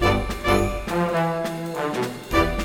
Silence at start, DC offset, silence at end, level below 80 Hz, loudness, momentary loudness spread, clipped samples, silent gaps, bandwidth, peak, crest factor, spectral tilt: 0 s; under 0.1%; 0 s; -32 dBFS; -24 LUFS; 6 LU; under 0.1%; none; over 20 kHz; -6 dBFS; 16 dB; -5.5 dB/octave